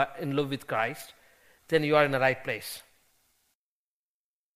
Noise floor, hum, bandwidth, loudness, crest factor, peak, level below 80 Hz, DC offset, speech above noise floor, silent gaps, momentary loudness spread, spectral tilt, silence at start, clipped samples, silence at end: under -90 dBFS; none; 15.5 kHz; -28 LUFS; 24 dB; -6 dBFS; -66 dBFS; under 0.1%; over 62 dB; none; 19 LU; -5 dB/octave; 0 s; under 0.1%; 1.75 s